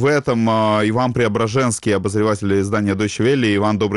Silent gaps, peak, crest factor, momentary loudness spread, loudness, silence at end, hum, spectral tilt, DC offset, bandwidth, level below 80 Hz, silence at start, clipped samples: none; -8 dBFS; 10 dB; 3 LU; -17 LUFS; 0 s; none; -5.5 dB/octave; 0.2%; 12 kHz; -48 dBFS; 0 s; under 0.1%